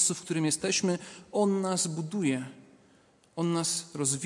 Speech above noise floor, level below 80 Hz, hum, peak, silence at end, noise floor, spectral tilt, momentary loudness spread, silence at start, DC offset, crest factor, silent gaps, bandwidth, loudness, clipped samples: 33 dB; -74 dBFS; none; -12 dBFS; 0 s; -62 dBFS; -4 dB/octave; 8 LU; 0 s; under 0.1%; 18 dB; none; 11.5 kHz; -29 LUFS; under 0.1%